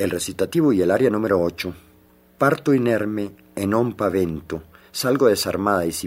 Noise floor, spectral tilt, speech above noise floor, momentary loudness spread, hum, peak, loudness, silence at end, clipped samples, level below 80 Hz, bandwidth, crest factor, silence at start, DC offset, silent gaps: -54 dBFS; -5.5 dB/octave; 33 dB; 13 LU; none; -2 dBFS; -21 LUFS; 0 s; under 0.1%; -56 dBFS; 16 kHz; 18 dB; 0 s; under 0.1%; none